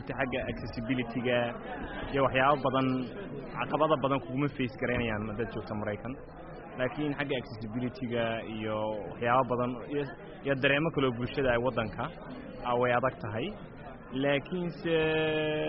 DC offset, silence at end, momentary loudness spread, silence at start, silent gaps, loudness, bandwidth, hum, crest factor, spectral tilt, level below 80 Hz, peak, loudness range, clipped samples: under 0.1%; 0 s; 12 LU; 0 s; none; -31 LUFS; 5.8 kHz; none; 20 dB; -4.5 dB/octave; -52 dBFS; -10 dBFS; 5 LU; under 0.1%